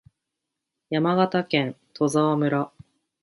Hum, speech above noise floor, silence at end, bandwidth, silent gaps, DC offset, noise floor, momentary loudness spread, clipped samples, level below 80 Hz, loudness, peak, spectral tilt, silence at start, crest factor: none; 61 dB; 0.55 s; 11.5 kHz; none; under 0.1%; -83 dBFS; 8 LU; under 0.1%; -68 dBFS; -24 LUFS; -6 dBFS; -6 dB/octave; 0.9 s; 18 dB